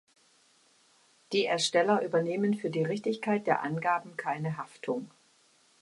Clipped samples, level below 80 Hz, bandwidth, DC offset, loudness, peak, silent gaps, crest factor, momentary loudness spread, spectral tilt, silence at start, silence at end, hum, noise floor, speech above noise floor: under 0.1%; -78 dBFS; 11.5 kHz; under 0.1%; -30 LUFS; -12 dBFS; none; 20 dB; 10 LU; -5 dB/octave; 1.3 s; 0.75 s; none; -65 dBFS; 36 dB